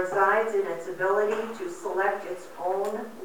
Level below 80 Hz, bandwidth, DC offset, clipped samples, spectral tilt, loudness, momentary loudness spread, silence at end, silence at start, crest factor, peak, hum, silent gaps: -80 dBFS; over 20 kHz; 0.4%; under 0.1%; -4.5 dB/octave; -27 LUFS; 12 LU; 0 s; 0 s; 18 dB; -10 dBFS; none; none